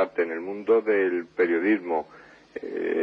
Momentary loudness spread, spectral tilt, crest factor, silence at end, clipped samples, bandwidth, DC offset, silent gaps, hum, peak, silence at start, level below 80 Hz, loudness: 15 LU; -7.5 dB/octave; 16 dB; 0 s; under 0.1%; 5.6 kHz; under 0.1%; none; none; -10 dBFS; 0 s; -70 dBFS; -25 LUFS